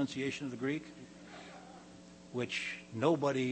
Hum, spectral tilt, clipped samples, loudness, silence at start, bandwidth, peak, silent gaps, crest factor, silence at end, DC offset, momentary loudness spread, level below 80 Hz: none; -5.5 dB/octave; under 0.1%; -36 LUFS; 0 s; 8.4 kHz; -16 dBFS; none; 22 dB; 0 s; under 0.1%; 22 LU; -72 dBFS